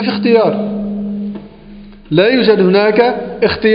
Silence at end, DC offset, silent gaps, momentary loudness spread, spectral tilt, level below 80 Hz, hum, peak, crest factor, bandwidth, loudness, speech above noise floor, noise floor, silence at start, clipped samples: 0 s; under 0.1%; none; 12 LU; -4.5 dB/octave; -44 dBFS; none; 0 dBFS; 12 dB; 5.2 kHz; -13 LUFS; 24 dB; -35 dBFS; 0 s; under 0.1%